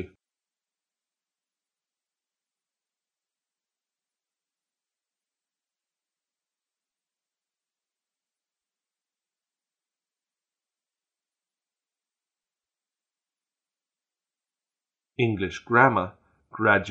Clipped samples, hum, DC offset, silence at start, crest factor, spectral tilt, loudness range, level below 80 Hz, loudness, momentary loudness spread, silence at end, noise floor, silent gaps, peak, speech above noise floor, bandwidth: under 0.1%; none; under 0.1%; 0 s; 30 dB; -6.5 dB/octave; 10 LU; -68 dBFS; -23 LUFS; 23 LU; 0 s; under -90 dBFS; none; -2 dBFS; over 68 dB; 7.8 kHz